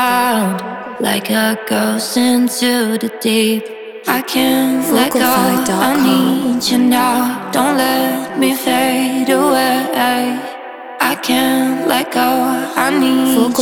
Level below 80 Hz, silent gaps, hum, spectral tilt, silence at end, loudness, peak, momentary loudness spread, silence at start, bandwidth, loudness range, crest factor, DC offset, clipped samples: -58 dBFS; none; none; -3.5 dB/octave; 0 s; -14 LUFS; 0 dBFS; 6 LU; 0 s; 19.5 kHz; 2 LU; 14 dB; 0.1%; under 0.1%